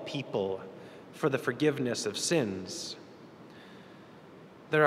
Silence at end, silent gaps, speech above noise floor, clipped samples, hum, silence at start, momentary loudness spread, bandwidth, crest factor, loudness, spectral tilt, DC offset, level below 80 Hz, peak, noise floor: 0 s; none; 20 dB; under 0.1%; none; 0 s; 23 LU; 15 kHz; 24 dB; -32 LUFS; -4 dB/octave; under 0.1%; -76 dBFS; -8 dBFS; -52 dBFS